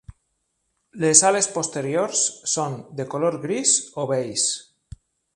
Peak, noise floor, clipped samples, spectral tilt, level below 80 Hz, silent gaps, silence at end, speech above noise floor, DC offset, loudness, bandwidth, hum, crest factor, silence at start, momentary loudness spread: 0 dBFS; -74 dBFS; under 0.1%; -2.5 dB/octave; -56 dBFS; none; 0.75 s; 52 dB; under 0.1%; -20 LUFS; 11.5 kHz; none; 24 dB; 0.1 s; 12 LU